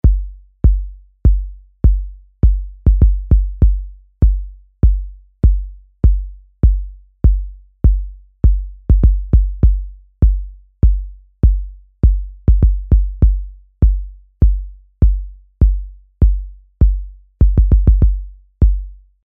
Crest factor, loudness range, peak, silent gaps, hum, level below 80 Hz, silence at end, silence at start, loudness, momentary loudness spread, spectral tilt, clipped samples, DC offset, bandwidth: 14 dB; 2 LU; 0 dBFS; none; none; -14 dBFS; 0.35 s; 0.05 s; -17 LUFS; 20 LU; -13.5 dB/octave; under 0.1%; under 0.1%; 1.5 kHz